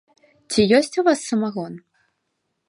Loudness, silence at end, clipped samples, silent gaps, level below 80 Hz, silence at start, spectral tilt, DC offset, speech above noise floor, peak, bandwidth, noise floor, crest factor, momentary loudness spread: -19 LUFS; 0.9 s; under 0.1%; none; -56 dBFS; 0.5 s; -4.5 dB/octave; under 0.1%; 56 dB; -2 dBFS; 11.5 kHz; -75 dBFS; 20 dB; 17 LU